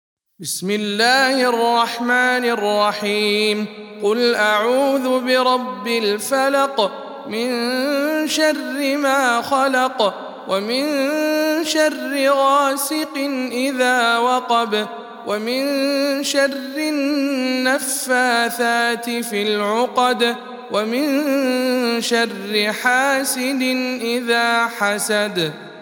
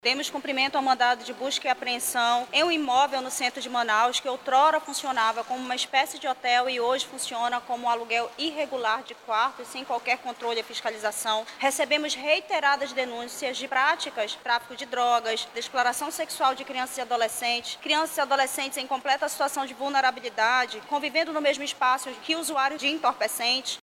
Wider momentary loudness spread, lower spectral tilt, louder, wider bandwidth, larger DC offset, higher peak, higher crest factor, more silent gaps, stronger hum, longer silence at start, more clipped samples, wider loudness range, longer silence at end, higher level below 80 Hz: about the same, 7 LU vs 7 LU; first, -2.5 dB/octave vs 0 dB/octave; first, -18 LUFS vs -26 LUFS; about the same, 18 kHz vs 16.5 kHz; neither; first, -2 dBFS vs -8 dBFS; about the same, 16 dB vs 18 dB; neither; neither; first, 0.4 s vs 0.05 s; neither; about the same, 2 LU vs 3 LU; about the same, 0 s vs 0.05 s; about the same, -78 dBFS vs -76 dBFS